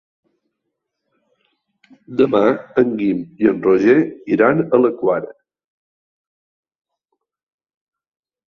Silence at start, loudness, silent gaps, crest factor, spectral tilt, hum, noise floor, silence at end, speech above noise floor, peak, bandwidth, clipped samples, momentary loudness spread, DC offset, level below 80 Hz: 2.1 s; -16 LUFS; none; 18 dB; -8.5 dB/octave; none; -77 dBFS; 3.15 s; 61 dB; -2 dBFS; 6.4 kHz; under 0.1%; 7 LU; under 0.1%; -60 dBFS